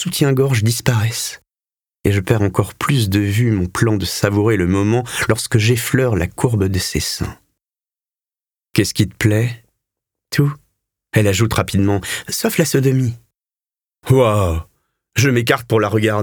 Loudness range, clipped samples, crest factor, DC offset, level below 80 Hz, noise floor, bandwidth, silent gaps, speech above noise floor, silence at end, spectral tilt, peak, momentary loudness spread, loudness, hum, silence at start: 4 LU; under 0.1%; 18 dB; under 0.1%; -40 dBFS; under -90 dBFS; over 20 kHz; none; over 74 dB; 0 s; -5.5 dB/octave; 0 dBFS; 8 LU; -17 LUFS; none; 0 s